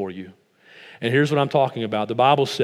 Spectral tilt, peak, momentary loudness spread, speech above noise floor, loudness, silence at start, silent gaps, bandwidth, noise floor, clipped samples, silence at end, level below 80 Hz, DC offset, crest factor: -6 dB/octave; -4 dBFS; 12 LU; 27 dB; -21 LUFS; 0 s; none; 14.5 kHz; -48 dBFS; under 0.1%; 0 s; -76 dBFS; under 0.1%; 18 dB